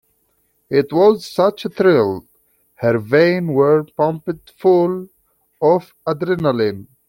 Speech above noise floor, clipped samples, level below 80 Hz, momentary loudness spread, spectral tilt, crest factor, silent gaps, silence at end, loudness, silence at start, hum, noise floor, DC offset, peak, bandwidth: 48 dB; under 0.1%; -58 dBFS; 8 LU; -7.5 dB/octave; 16 dB; none; 0.25 s; -17 LUFS; 0.7 s; none; -63 dBFS; under 0.1%; -2 dBFS; 16.5 kHz